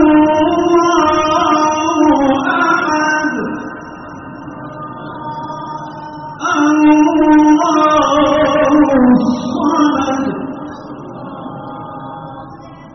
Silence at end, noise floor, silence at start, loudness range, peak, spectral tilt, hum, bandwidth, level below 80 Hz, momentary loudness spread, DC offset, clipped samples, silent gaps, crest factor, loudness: 0.05 s; -33 dBFS; 0 s; 10 LU; 0 dBFS; -4 dB/octave; none; 6.4 kHz; -44 dBFS; 19 LU; under 0.1%; under 0.1%; none; 14 dB; -12 LUFS